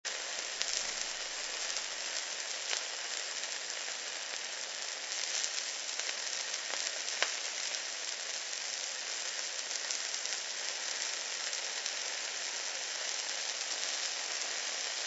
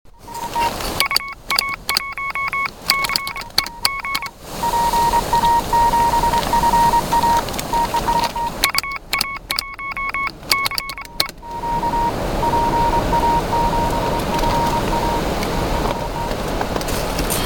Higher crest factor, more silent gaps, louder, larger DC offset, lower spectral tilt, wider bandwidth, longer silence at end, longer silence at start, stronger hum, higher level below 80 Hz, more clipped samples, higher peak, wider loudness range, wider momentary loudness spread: first, 30 dB vs 20 dB; neither; second, -35 LUFS vs -19 LUFS; neither; second, 3.5 dB/octave vs -3.5 dB/octave; second, 8.2 kHz vs 17.5 kHz; about the same, 0 s vs 0 s; about the same, 0.05 s vs 0.05 s; neither; second, -76 dBFS vs -30 dBFS; neither; second, -8 dBFS vs 0 dBFS; second, 1 LU vs 4 LU; second, 4 LU vs 7 LU